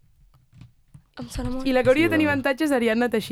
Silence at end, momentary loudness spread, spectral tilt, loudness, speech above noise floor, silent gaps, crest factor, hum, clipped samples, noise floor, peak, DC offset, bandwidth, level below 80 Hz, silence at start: 0 s; 14 LU; -5.5 dB/octave; -22 LUFS; 35 dB; none; 16 dB; none; under 0.1%; -57 dBFS; -8 dBFS; under 0.1%; 16.5 kHz; -42 dBFS; 0.65 s